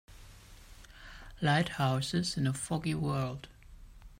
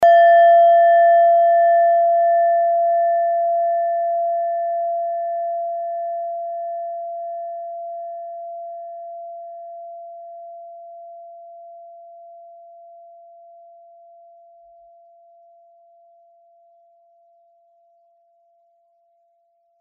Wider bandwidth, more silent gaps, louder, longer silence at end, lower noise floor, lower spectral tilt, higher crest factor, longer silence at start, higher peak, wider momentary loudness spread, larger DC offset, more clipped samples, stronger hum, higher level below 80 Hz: first, 16 kHz vs 3.4 kHz; neither; second, -32 LUFS vs -17 LUFS; second, 0.05 s vs 7.85 s; second, -53 dBFS vs -64 dBFS; first, -5 dB/octave vs 1.5 dB/octave; about the same, 18 dB vs 14 dB; about the same, 0.1 s vs 0 s; second, -16 dBFS vs -6 dBFS; second, 22 LU vs 26 LU; neither; neither; neither; first, -54 dBFS vs -76 dBFS